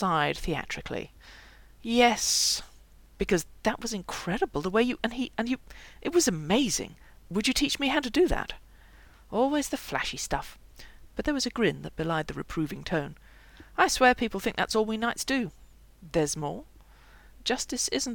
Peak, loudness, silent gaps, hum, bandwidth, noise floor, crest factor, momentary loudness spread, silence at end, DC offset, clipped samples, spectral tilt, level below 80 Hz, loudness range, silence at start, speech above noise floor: -8 dBFS; -28 LUFS; none; none; 18 kHz; -53 dBFS; 22 dB; 12 LU; 0 s; under 0.1%; under 0.1%; -3 dB/octave; -46 dBFS; 4 LU; 0 s; 25 dB